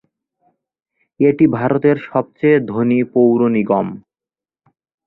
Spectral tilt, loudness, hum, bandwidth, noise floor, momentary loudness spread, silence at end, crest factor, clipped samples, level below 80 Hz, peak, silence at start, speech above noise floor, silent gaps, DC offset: -11.5 dB/octave; -15 LUFS; none; 4.1 kHz; under -90 dBFS; 6 LU; 1.1 s; 16 dB; under 0.1%; -58 dBFS; -2 dBFS; 1.2 s; over 76 dB; none; under 0.1%